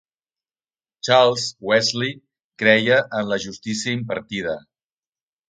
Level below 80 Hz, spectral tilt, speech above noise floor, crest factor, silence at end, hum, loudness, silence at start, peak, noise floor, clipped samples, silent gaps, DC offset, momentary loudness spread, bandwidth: -62 dBFS; -3.5 dB/octave; over 70 dB; 22 dB; 0.9 s; none; -20 LUFS; 1.05 s; 0 dBFS; under -90 dBFS; under 0.1%; 2.44-2.50 s; under 0.1%; 12 LU; 9.4 kHz